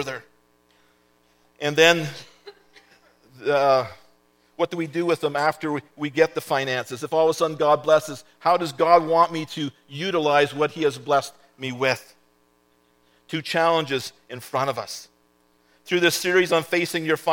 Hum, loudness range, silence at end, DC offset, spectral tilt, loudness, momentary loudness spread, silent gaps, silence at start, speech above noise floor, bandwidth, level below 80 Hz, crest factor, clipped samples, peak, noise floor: 60 Hz at -65 dBFS; 6 LU; 0 s; under 0.1%; -4 dB/octave; -22 LUFS; 14 LU; none; 0 s; 41 dB; 17.5 kHz; -72 dBFS; 22 dB; under 0.1%; 0 dBFS; -63 dBFS